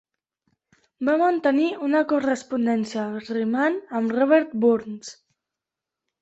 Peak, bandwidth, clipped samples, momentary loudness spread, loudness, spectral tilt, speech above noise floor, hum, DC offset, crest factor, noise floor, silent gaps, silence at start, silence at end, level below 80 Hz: -6 dBFS; 8.2 kHz; under 0.1%; 9 LU; -22 LUFS; -5.5 dB/octave; 65 dB; none; under 0.1%; 18 dB; -87 dBFS; none; 1 s; 1.1 s; -68 dBFS